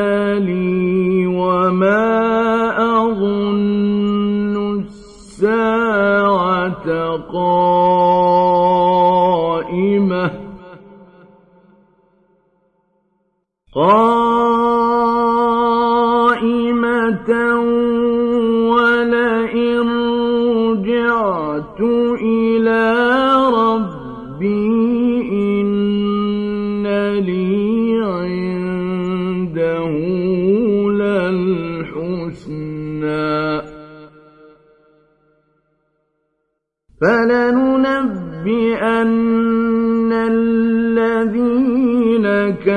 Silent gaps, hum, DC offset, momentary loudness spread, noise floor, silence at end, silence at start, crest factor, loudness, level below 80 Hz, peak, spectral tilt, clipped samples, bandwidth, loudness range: none; none; under 0.1%; 8 LU; -73 dBFS; 0 s; 0 s; 14 dB; -16 LUFS; -48 dBFS; -2 dBFS; -8 dB/octave; under 0.1%; 9.2 kHz; 7 LU